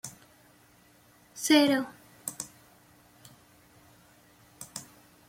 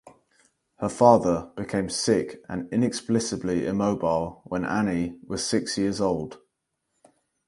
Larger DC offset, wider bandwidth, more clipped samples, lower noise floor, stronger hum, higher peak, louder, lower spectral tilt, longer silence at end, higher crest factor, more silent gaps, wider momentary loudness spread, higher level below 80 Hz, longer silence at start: neither; first, 16.5 kHz vs 11.5 kHz; neither; second, -60 dBFS vs -79 dBFS; first, 60 Hz at -75 dBFS vs none; second, -8 dBFS vs -2 dBFS; second, -28 LUFS vs -25 LUFS; second, -2.5 dB/octave vs -5 dB/octave; second, 0.45 s vs 1.1 s; about the same, 24 dB vs 24 dB; neither; first, 22 LU vs 11 LU; second, -74 dBFS vs -54 dBFS; about the same, 0.05 s vs 0.05 s